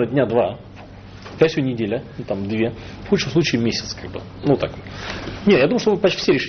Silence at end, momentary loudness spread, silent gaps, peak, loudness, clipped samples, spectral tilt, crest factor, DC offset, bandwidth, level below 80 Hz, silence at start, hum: 0 s; 18 LU; none; 0 dBFS; -20 LUFS; under 0.1%; -5 dB/octave; 20 dB; under 0.1%; 6.6 kHz; -46 dBFS; 0 s; none